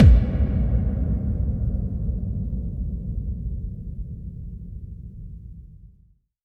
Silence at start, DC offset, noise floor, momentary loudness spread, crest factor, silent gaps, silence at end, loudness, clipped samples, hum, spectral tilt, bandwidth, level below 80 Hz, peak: 0 s; under 0.1%; -58 dBFS; 17 LU; 20 dB; none; 0.6 s; -26 LUFS; under 0.1%; none; -10.5 dB/octave; 3.6 kHz; -26 dBFS; -2 dBFS